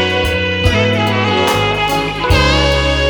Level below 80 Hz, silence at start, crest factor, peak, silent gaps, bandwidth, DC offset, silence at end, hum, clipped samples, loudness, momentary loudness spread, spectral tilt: -22 dBFS; 0 s; 12 dB; 0 dBFS; none; over 20 kHz; under 0.1%; 0 s; none; under 0.1%; -13 LUFS; 4 LU; -5 dB/octave